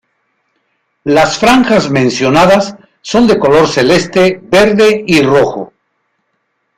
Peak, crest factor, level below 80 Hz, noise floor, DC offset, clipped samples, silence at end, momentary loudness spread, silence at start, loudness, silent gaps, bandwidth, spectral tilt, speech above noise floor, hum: 0 dBFS; 10 dB; -40 dBFS; -64 dBFS; under 0.1%; under 0.1%; 1.15 s; 9 LU; 1.05 s; -9 LUFS; none; 16 kHz; -5 dB/octave; 56 dB; none